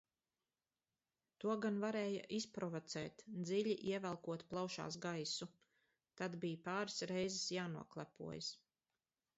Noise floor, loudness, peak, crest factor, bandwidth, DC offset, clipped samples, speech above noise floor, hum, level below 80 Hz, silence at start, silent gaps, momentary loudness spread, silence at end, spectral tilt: under -90 dBFS; -44 LUFS; -28 dBFS; 16 dB; 8 kHz; under 0.1%; under 0.1%; over 46 dB; none; -82 dBFS; 1.4 s; none; 8 LU; 0.8 s; -4 dB/octave